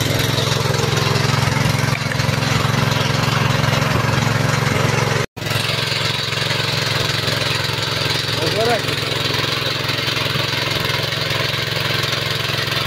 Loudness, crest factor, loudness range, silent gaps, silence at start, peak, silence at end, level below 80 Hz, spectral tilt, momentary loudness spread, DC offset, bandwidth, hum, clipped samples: -18 LUFS; 16 dB; 1 LU; 5.28-5.36 s; 0 s; -4 dBFS; 0 s; -40 dBFS; -4 dB/octave; 2 LU; under 0.1%; 16.5 kHz; none; under 0.1%